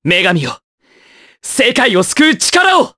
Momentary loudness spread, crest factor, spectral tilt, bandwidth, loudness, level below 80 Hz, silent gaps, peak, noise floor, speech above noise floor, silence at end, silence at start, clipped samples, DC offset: 14 LU; 14 dB; -3 dB/octave; 11 kHz; -11 LUFS; -52 dBFS; 0.64-0.78 s; 0 dBFS; -46 dBFS; 34 dB; 0.1 s; 0.05 s; under 0.1%; under 0.1%